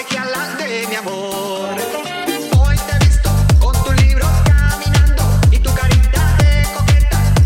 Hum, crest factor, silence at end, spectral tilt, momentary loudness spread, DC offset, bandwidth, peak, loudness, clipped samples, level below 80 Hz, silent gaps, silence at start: none; 10 dB; 0 s; -5 dB/octave; 8 LU; under 0.1%; 16.5 kHz; -2 dBFS; -15 LUFS; under 0.1%; -16 dBFS; none; 0 s